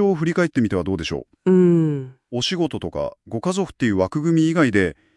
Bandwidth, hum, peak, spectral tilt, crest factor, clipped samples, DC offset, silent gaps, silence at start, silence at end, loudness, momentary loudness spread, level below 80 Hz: 11 kHz; none; -4 dBFS; -6.5 dB/octave; 16 dB; under 0.1%; under 0.1%; none; 0 s; 0.25 s; -20 LUFS; 11 LU; -52 dBFS